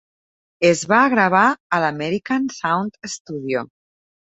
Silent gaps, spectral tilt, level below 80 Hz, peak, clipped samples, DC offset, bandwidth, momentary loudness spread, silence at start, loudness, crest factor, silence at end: 1.60-1.70 s, 3.20-3.25 s; -4.5 dB/octave; -62 dBFS; -2 dBFS; under 0.1%; under 0.1%; 8.2 kHz; 14 LU; 0.6 s; -19 LUFS; 18 dB; 0.7 s